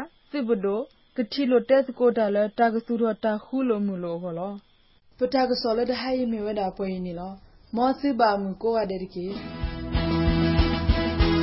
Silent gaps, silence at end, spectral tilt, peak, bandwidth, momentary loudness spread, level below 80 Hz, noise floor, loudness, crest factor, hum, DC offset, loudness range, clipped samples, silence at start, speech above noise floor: none; 0 s; -10.5 dB/octave; -8 dBFS; 5.8 kHz; 11 LU; -34 dBFS; -58 dBFS; -25 LUFS; 16 dB; none; under 0.1%; 3 LU; under 0.1%; 0 s; 33 dB